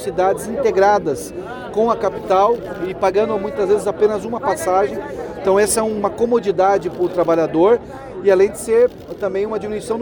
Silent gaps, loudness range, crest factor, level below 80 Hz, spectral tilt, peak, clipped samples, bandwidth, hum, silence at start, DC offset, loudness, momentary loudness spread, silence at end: none; 2 LU; 14 dB; -46 dBFS; -5 dB/octave; -4 dBFS; under 0.1%; 19 kHz; none; 0 s; under 0.1%; -18 LUFS; 9 LU; 0 s